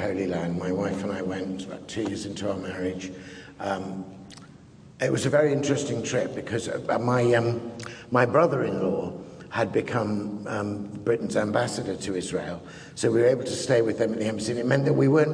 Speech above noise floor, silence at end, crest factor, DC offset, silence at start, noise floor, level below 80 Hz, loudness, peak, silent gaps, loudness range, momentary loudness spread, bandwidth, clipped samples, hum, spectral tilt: 23 dB; 0 s; 20 dB; under 0.1%; 0 s; -49 dBFS; -60 dBFS; -26 LUFS; -6 dBFS; none; 7 LU; 14 LU; 10.5 kHz; under 0.1%; none; -6 dB/octave